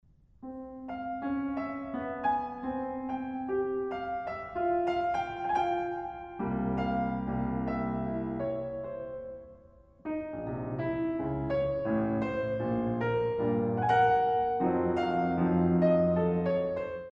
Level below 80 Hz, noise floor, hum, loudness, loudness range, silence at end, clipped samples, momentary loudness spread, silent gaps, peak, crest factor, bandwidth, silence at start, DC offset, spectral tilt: -52 dBFS; -57 dBFS; none; -31 LUFS; 8 LU; 0 s; under 0.1%; 12 LU; none; -14 dBFS; 16 dB; 6.4 kHz; 0.4 s; under 0.1%; -9 dB/octave